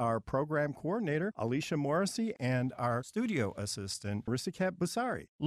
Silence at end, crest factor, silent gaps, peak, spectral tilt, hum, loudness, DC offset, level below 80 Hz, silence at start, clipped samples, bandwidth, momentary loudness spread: 0 s; 14 dB; 5.29-5.39 s; -18 dBFS; -5.5 dB/octave; none; -34 LUFS; under 0.1%; -64 dBFS; 0 s; under 0.1%; 15 kHz; 5 LU